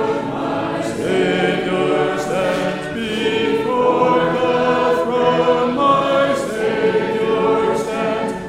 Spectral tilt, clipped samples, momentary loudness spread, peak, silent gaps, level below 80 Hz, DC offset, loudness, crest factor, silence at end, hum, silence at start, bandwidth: -5.5 dB/octave; under 0.1%; 6 LU; -2 dBFS; none; -48 dBFS; under 0.1%; -17 LUFS; 14 dB; 0 s; none; 0 s; 14.5 kHz